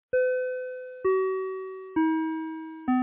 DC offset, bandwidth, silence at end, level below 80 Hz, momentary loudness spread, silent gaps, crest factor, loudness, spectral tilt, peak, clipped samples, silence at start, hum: under 0.1%; 3.8 kHz; 0 s; -66 dBFS; 10 LU; none; 12 dB; -29 LUFS; -9.5 dB/octave; -16 dBFS; under 0.1%; 0.15 s; none